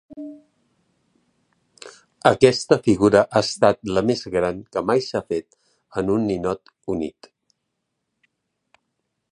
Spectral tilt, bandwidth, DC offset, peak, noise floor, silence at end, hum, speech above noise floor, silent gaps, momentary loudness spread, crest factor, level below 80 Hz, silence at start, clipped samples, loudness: -5.5 dB/octave; 11 kHz; under 0.1%; 0 dBFS; -77 dBFS; 2.2 s; none; 58 dB; none; 19 LU; 22 dB; -52 dBFS; 0.1 s; under 0.1%; -21 LUFS